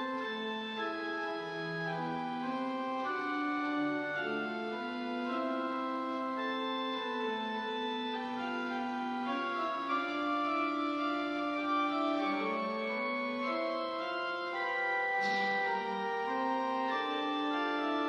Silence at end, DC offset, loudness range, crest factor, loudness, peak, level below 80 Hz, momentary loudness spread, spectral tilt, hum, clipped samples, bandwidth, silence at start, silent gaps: 0 s; under 0.1%; 3 LU; 12 dB; -35 LUFS; -22 dBFS; -80 dBFS; 5 LU; -5 dB/octave; none; under 0.1%; 10 kHz; 0 s; none